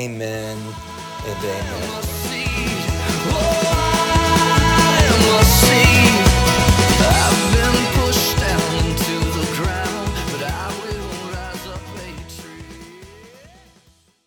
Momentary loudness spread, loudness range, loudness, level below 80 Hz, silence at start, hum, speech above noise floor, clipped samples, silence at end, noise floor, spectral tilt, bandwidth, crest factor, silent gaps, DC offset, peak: 19 LU; 15 LU; -16 LUFS; -26 dBFS; 0 s; none; 29 dB; under 0.1%; 1 s; -55 dBFS; -4 dB/octave; over 20 kHz; 16 dB; none; under 0.1%; 0 dBFS